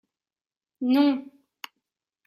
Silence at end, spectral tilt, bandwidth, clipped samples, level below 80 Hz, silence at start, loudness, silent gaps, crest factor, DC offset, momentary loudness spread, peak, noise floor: 1.05 s; -5 dB/octave; 14.5 kHz; under 0.1%; -84 dBFS; 0.8 s; -24 LUFS; none; 18 dB; under 0.1%; 22 LU; -10 dBFS; under -90 dBFS